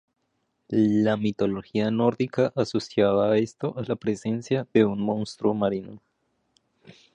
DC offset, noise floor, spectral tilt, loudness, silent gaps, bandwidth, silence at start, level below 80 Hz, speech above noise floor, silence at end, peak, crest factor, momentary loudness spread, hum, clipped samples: under 0.1%; -74 dBFS; -7 dB/octave; -25 LUFS; none; 9.6 kHz; 0.7 s; -60 dBFS; 50 dB; 1.15 s; -6 dBFS; 20 dB; 8 LU; none; under 0.1%